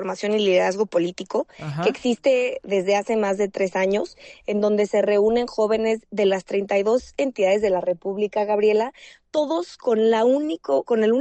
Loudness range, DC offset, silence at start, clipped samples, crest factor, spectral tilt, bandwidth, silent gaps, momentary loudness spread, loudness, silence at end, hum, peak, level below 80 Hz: 1 LU; under 0.1%; 0 s; under 0.1%; 14 dB; -5.5 dB/octave; 8.6 kHz; none; 7 LU; -22 LUFS; 0 s; none; -8 dBFS; -58 dBFS